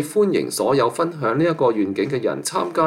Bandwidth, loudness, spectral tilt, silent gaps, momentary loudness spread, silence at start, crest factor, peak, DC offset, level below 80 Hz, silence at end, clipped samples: 16.5 kHz; -20 LUFS; -5 dB/octave; none; 4 LU; 0 s; 14 dB; -6 dBFS; under 0.1%; -64 dBFS; 0 s; under 0.1%